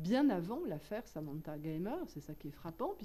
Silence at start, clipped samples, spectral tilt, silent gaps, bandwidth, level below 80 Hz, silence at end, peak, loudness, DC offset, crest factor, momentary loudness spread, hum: 0 s; under 0.1%; -7.5 dB/octave; none; 14 kHz; -62 dBFS; 0 s; -22 dBFS; -40 LUFS; under 0.1%; 16 dB; 15 LU; none